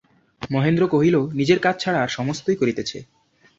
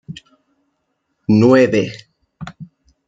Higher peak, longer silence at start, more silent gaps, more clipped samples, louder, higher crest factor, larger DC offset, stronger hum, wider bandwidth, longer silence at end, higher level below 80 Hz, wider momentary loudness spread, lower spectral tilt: about the same, -4 dBFS vs -2 dBFS; first, 0.4 s vs 0.1 s; neither; neither; second, -21 LUFS vs -14 LUFS; about the same, 18 dB vs 16 dB; neither; neither; about the same, 7.8 kHz vs 7.8 kHz; about the same, 0.55 s vs 0.45 s; about the same, -56 dBFS vs -56 dBFS; second, 11 LU vs 25 LU; second, -6 dB/octave vs -7.5 dB/octave